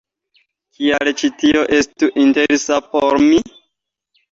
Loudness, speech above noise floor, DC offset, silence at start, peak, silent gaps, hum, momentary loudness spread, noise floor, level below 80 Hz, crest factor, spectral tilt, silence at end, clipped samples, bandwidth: -15 LUFS; 60 dB; under 0.1%; 0.8 s; -2 dBFS; none; none; 5 LU; -74 dBFS; -50 dBFS; 14 dB; -3.5 dB/octave; 0.85 s; under 0.1%; 7.8 kHz